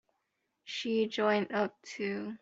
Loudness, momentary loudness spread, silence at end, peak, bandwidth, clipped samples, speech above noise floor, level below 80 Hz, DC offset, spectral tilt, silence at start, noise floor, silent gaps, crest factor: -33 LUFS; 9 LU; 0.05 s; -16 dBFS; 7.8 kHz; under 0.1%; 49 dB; -78 dBFS; under 0.1%; -5 dB/octave; 0.65 s; -82 dBFS; none; 20 dB